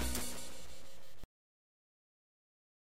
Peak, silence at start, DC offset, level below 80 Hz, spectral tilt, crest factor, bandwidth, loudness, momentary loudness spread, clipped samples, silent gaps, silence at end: -20 dBFS; 0 s; 1%; -52 dBFS; -3 dB/octave; 26 dB; 16 kHz; -44 LUFS; 19 LU; under 0.1%; none; 1.65 s